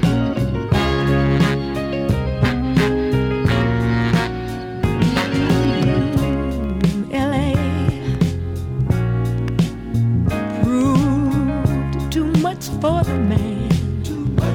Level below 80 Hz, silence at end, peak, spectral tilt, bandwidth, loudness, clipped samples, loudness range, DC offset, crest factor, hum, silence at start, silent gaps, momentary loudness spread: -30 dBFS; 0 s; -2 dBFS; -7 dB/octave; 17 kHz; -19 LUFS; under 0.1%; 2 LU; under 0.1%; 16 dB; none; 0 s; none; 5 LU